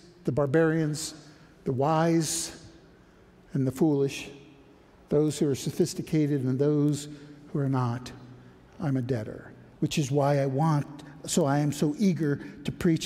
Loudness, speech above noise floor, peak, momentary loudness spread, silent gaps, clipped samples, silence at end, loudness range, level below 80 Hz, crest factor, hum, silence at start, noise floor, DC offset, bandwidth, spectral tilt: -27 LUFS; 29 dB; -10 dBFS; 14 LU; none; under 0.1%; 0 s; 3 LU; -58 dBFS; 16 dB; none; 0.25 s; -55 dBFS; under 0.1%; 15.5 kHz; -6 dB/octave